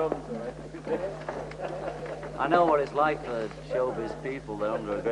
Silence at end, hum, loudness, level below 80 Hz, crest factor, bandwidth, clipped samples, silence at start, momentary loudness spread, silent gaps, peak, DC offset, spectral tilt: 0 s; none; -30 LUFS; -52 dBFS; 22 dB; 11 kHz; under 0.1%; 0 s; 13 LU; none; -8 dBFS; under 0.1%; -6.5 dB/octave